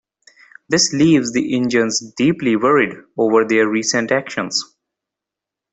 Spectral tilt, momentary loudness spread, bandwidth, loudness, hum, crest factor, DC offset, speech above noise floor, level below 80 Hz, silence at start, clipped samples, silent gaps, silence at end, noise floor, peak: -4 dB/octave; 7 LU; 8.4 kHz; -16 LUFS; none; 16 dB; under 0.1%; 69 dB; -58 dBFS; 0.7 s; under 0.1%; none; 1.1 s; -85 dBFS; -2 dBFS